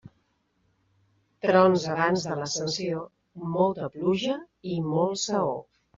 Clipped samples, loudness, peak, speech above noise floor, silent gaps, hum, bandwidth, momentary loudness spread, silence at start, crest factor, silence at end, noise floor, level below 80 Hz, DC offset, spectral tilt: under 0.1%; -26 LUFS; -6 dBFS; 45 dB; none; none; 7.6 kHz; 13 LU; 1.45 s; 20 dB; 0.35 s; -71 dBFS; -66 dBFS; under 0.1%; -4.5 dB/octave